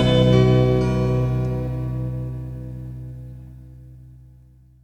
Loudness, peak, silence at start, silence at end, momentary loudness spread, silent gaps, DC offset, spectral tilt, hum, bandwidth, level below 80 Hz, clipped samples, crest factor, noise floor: -20 LUFS; -4 dBFS; 0 s; 0.7 s; 22 LU; none; under 0.1%; -8 dB/octave; none; 8.2 kHz; -34 dBFS; under 0.1%; 18 dB; -50 dBFS